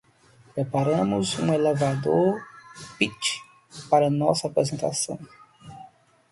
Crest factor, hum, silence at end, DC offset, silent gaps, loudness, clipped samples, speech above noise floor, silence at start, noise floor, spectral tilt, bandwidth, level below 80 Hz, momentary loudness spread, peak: 20 dB; none; 0.45 s; under 0.1%; none; -24 LUFS; under 0.1%; 32 dB; 0.55 s; -56 dBFS; -5 dB/octave; 11.5 kHz; -62 dBFS; 21 LU; -6 dBFS